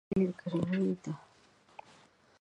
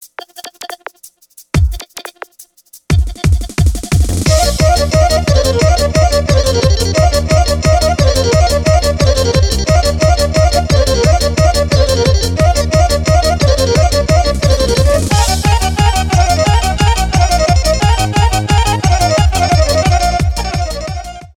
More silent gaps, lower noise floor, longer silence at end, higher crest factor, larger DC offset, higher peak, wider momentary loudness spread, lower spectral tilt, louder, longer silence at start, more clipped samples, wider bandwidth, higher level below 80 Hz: neither; first, -64 dBFS vs -42 dBFS; first, 1.2 s vs 0.15 s; first, 18 dB vs 10 dB; neither; second, -18 dBFS vs 0 dBFS; first, 22 LU vs 7 LU; first, -8.5 dB/octave vs -5 dB/octave; second, -34 LUFS vs -12 LUFS; about the same, 0.1 s vs 0 s; neither; second, 8.6 kHz vs 17.5 kHz; second, -64 dBFS vs -16 dBFS